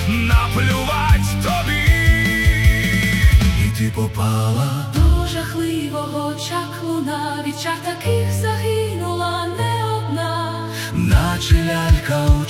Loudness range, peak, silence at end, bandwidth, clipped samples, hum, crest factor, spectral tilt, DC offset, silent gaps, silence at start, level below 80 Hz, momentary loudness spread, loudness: 6 LU; 0 dBFS; 0 s; 16.5 kHz; under 0.1%; none; 16 dB; -5.5 dB/octave; under 0.1%; none; 0 s; -22 dBFS; 8 LU; -18 LUFS